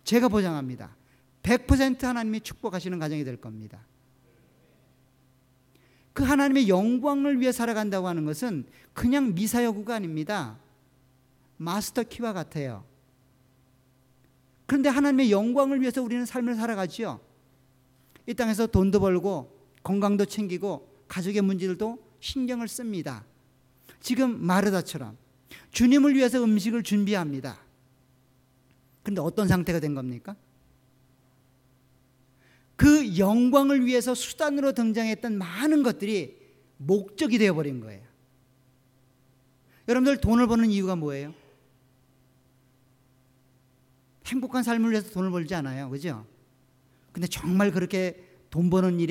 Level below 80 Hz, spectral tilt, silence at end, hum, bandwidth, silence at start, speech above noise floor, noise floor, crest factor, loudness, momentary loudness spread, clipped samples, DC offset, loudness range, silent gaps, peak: -48 dBFS; -6 dB/octave; 0 s; none; 16.5 kHz; 0.05 s; 38 dB; -63 dBFS; 22 dB; -26 LUFS; 16 LU; under 0.1%; under 0.1%; 9 LU; none; -4 dBFS